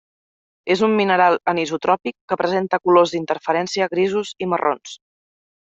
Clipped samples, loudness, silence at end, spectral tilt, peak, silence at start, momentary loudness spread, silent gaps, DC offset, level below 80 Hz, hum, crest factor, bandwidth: under 0.1%; -19 LUFS; 0.8 s; -5 dB/octave; -2 dBFS; 0.65 s; 8 LU; 2.21-2.28 s; under 0.1%; -64 dBFS; none; 18 dB; 8 kHz